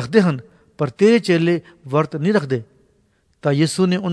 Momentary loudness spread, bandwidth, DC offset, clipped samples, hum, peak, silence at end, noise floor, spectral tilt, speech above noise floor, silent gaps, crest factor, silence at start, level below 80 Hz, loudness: 11 LU; 11 kHz; under 0.1%; under 0.1%; none; 0 dBFS; 0 s; -61 dBFS; -6.5 dB/octave; 44 dB; none; 18 dB; 0 s; -60 dBFS; -18 LUFS